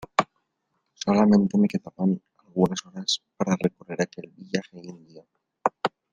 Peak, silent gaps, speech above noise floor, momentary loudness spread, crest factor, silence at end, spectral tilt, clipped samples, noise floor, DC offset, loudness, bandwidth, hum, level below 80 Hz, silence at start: -4 dBFS; none; 52 dB; 14 LU; 22 dB; 0.25 s; -5.5 dB/octave; under 0.1%; -76 dBFS; under 0.1%; -25 LUFS; 9.4 kHz; none; -62 dBFS; 0 s